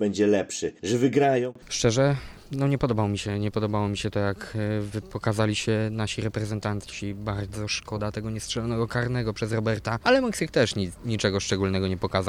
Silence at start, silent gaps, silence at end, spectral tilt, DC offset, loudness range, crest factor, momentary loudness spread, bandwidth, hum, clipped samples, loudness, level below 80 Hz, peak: 0 s; none; 0 s; -5.5 dB/octave; under 0.1%; 4 LU; 18 dB; 9 LU; 14 kHz; none; under 0.1%; -26 LUFS; -48 dBFS; -8 dBFS